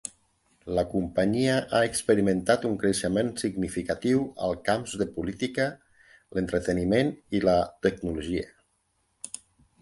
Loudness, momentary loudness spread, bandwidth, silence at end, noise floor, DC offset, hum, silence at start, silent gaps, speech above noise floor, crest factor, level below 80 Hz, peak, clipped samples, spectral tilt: -27 LUFS; 10 LU; 12 kHz; 0.55 s; -72 dBFS; under 0.1%; none; 0.05 s; none; 46 dB; 20 dB; -50 dBFS; -8 dBFS; under 0.1%; -5 dB/octave